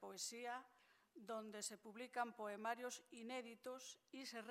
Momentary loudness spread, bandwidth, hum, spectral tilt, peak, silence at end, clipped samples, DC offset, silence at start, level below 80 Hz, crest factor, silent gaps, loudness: 9 LU; 16 kHz; none; -2 dB/octave; -30 dBFS; 0 s; under 0.1%; under 0.1%; 0 s; under -90 dBFS; 22 dB; none; -51 LUFS